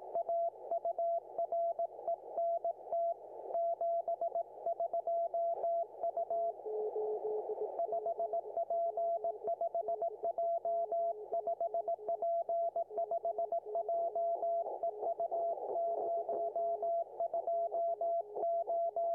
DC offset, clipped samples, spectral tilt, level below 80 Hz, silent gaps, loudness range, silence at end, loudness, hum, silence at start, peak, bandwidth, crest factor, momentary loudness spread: under 0.1%; under 0.1%; -8.5 dB/octave; under -90 dBFS; none; 1 LU; 0 s; -37 LUFS; 50 Hz at -85 dBFS; 0 s; -28 dBFS; 1.6 kHz; 8 dB; 4 LU